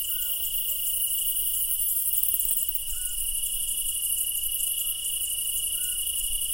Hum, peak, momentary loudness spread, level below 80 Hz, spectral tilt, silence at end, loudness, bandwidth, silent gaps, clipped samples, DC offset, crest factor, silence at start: none; -6 dBFS; 4 LU; -44 dBFS; 2.5 dB/octave; 0 s; -24 LUFS; 17.5 kHz; none; under 0.1%; under 0.1%; 22 dB; 0 s